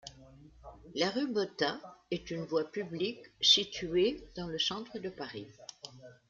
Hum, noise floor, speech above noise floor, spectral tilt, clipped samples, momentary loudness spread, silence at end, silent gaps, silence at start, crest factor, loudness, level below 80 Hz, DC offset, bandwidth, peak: none; -56 dBFS; 22 dB; -3.5 dB/octave; under 0.1%; 21 LU; 0.15 s; none; 0.05 s; 24 dB; -32 LUFS; -64 dBFS; under 0.1%; 7.6 kHz; -10 dBFS